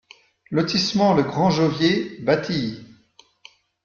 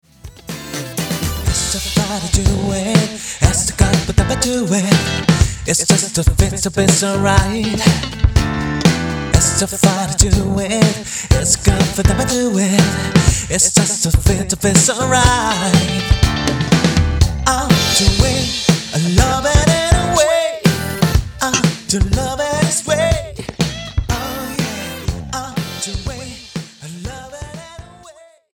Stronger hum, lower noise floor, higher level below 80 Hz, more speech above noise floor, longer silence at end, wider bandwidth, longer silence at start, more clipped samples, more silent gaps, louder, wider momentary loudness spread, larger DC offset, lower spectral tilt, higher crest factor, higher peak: neither; first, -56 dBFS vs -43 dBFS; second, -56 dBFS vs -24 dBFS; first, 36 dB vs 29 dB; first, 1 s vs 0.45 s; second, 7.2 kHz vs over 20 kHz; first, 0.5 s vs 0.25 s; neither; neither; second, -21 LUFS vs -15 LUFS; second, 8 LU vs 11 LU; neither; first, -5.5 dB/octave vs -4 dB/octave; about the same, 18 dB vs 16 dB; second, -6 dBFS vs 0 dBFS